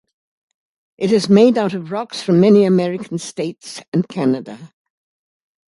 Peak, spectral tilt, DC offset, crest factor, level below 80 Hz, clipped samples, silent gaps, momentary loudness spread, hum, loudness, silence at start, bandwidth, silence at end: 0 dBFS; -6.5 dB/octave; under 0.1%; 16 dB; -62 dBFS; under 0.1%; 3.88-3.92 s; 14 LU; none; -16 LUFS; 1 s; 11.5 kHz; 1.05 s